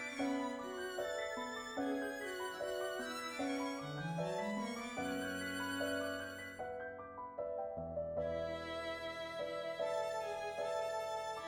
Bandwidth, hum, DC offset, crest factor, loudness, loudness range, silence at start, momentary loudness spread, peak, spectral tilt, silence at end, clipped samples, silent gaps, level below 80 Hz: over 20 kHz; none; under 0.1%; 14 dB; -41 LUFS; 2 LU; 0 s; 5 LU; -28 dBFS; -4.5 dB/octave; 0 s; under 0.1%; none; -68 dBFS